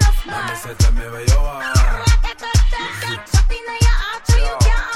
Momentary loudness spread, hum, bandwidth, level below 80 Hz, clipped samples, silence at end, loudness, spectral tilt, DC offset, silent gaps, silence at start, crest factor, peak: 7 LU; none; 14.5 kHz; -16 dBFS; under 0.1%; 0 s; -18 LUFS; -4 dB/octave; under 0.1%; none; 0 s; 14 dB; -2 dBFS